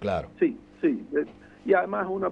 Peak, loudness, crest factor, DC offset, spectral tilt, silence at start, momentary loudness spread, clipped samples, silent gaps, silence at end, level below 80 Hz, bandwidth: -10 dBFS; -27 LUFS; 18 dB; under 0.1%; -8.5 dB/octave; 0 s; 7 LU; under 0.1%; none; 0 s; -56 dBFS; 6.8 kHz